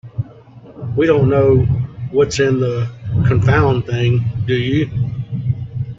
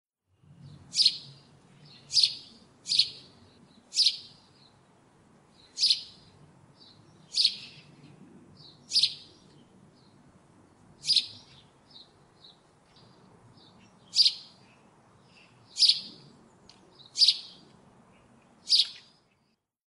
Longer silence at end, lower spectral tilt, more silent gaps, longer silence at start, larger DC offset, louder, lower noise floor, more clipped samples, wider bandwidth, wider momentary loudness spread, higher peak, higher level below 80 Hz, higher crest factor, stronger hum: second, 0.05 s vs 0.9 s; first, -7 dB/octave vs 1 dB/octave; neither; second, 0.05 s vs 0.65 s; neither; first, -16 LUFS vs -25 LUFS; second, -40 dBFS vs -74 dBFS; neither; second, 7.8 kHz vs 11.5 kHz; second, 10 LU vs 22 LU; first, -2 dBFS vs -8 dBFS; first, -38 dBFS vs -76 dBFS; second, 14 dB vs 26 dB; neither